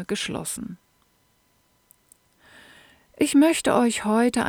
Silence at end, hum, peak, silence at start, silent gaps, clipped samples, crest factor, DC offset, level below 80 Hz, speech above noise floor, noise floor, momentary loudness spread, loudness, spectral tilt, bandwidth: 0 s; none; -6 dBFS; 0 s; none; under 0.1%; 20 dB; under 0.1%; -58 dBFS; 43 dB; -65 dBFS; 13 LU; -22 LUFS; -4 dB/octave; 18.5 kHz